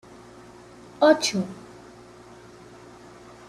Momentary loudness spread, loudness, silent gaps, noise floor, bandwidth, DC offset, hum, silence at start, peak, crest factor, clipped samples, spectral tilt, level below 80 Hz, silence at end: 28 LU; -22 LUFS; none; -47 dBFS; 13.5 kHz; under 0.1%; none; 1 s; -4 dBFS; 24 dB; under 0.1%; -4 dB/octave; -64 dBFS; 1.9 s